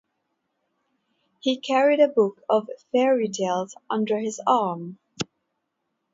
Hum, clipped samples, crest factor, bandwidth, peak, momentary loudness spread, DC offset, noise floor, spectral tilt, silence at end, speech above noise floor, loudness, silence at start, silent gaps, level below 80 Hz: none; under 0.1%; 18 dB; 7.8 kHz; -6 dBFS; 15 LU; under 0.1%; -78 dBFS; -4.5 dB/octave; 0.9 s; 55 dB; -23 LUFS; 1.45 s; none; -72 dBFS